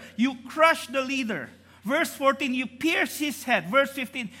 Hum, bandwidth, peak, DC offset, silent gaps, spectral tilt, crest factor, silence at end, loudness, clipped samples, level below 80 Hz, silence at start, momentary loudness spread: none; 16.5 kHz; -4 dBFS; under 0.1%; none; -3.5 dB/octave; 22 dB; 0 s; -25 LUFS; under 0.1%; -76 dBFS; 0 s; 11 LU